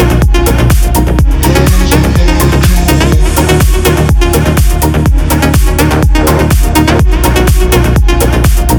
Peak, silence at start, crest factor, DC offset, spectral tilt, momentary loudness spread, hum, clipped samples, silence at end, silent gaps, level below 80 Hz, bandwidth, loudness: 0 dBFS; 0 s; 6 dB; under 0.1%; -5.5 dB/octave; 1 LU; none; 0.7%; 0 s; none; -10 dBFS; over 20 kHz; -8 LUFS